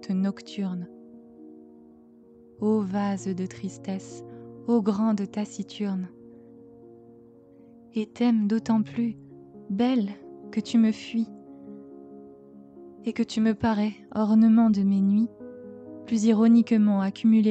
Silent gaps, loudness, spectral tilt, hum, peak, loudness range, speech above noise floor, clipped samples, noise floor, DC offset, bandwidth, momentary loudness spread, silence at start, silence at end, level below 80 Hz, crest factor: none; -25 LUFS; -7 dB/octave; none; -8 dBFS; 9 LU; 29 dB; under 0.1%; -53 dBFS; under 0.1%; 8.2 kHz; 23 LU; 0 s; 0 s; -66 dBFS; 16 dB